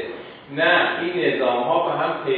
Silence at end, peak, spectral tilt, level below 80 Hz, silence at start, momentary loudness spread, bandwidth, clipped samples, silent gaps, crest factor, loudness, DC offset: 0 s; -4 dBFS; -7.5 dB/octave; -66 dBFS; 0 s; 15 LU; 4.8 kHz; under 0.1%; none; 16 dB; -20 LUFS; under 0.1%